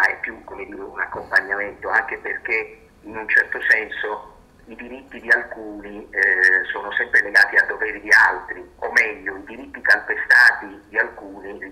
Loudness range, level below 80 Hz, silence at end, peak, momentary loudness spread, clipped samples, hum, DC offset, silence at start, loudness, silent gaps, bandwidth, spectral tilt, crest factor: 5 LU; -54 dBFS; 0 s; -4 dBFS; 21 LU; under 0.1%; none; under 0.1%; 0 s; -18 LUFS; none; 15.5 kHz; -2 dB/octave; 16 dB